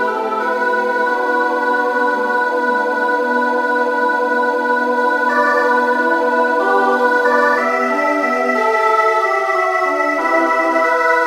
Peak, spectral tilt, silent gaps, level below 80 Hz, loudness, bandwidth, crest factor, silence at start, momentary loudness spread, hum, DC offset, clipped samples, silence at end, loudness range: -2 dBFS; -3 dB/octave; none; -60 dBFS; -15 LUFS; 15.5 kHz; 14 dB; 0 s; 3 LU; none; under 0.1%; under 0.1%; 0 s; 2 LU